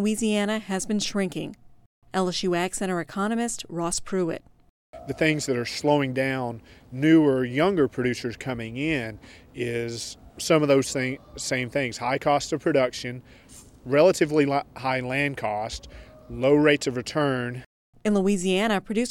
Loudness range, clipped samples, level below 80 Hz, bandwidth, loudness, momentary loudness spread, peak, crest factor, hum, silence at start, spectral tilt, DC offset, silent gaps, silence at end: 4 LU; under 0.1%; -52 dBFS; 16 kHz; -25 LUFS; 14 LU; -4 dBFS; 20 dB; none; 0 s; -5 dB/octave; under 0.1%; 1.86-2.02 s, 4.69-4.93 s, 17.66-17.93 s; 0 s